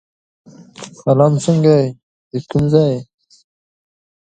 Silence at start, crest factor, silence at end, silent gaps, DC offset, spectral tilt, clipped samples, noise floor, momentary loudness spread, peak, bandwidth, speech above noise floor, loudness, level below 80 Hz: 0.8 s; 18 dB; 1.3 s; 2.03-2.31 s; under 0.1%; -7.5 dB/octave; under 0.1%; -37 dBFS; 15 LU; 0 dBFS; 9.2 kHz; 23 dB; -15 LUFS; -48 dBFS